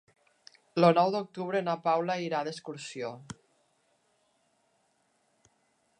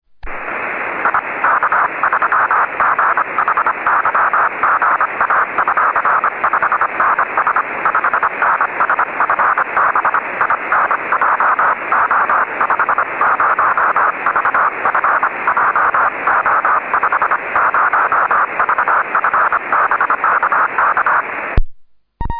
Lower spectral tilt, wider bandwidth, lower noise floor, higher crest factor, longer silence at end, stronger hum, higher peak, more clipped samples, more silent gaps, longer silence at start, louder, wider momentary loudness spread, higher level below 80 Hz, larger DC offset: second, -6 dB/octave vs -8 dB/octave; first, 10 kHz vs 4.7 kHz; first, -73 dBFS vs -36 dBFS; first, 24 dB vs 14 dB; first, 2.65 s vs 0 s; neither; second, -10 dBFS vs 0 dBFS; neither; neither; first, 0.75 s vs 0.25 s; second, -29 LUFS vs -14 LUFS; first, 18 LU vs 3 LU; second, -78 dBFS vs -34 dBFS; neither